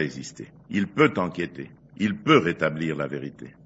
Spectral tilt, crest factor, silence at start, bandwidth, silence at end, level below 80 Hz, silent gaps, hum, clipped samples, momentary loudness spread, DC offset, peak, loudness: -6 dB/octave; 22 dB; 0 s; 8 kHz; 0.15 s; -62 dBFS; none; none; under 0.1%; 19 LU; under 0.1%; -4 dBFS; -24 LUFS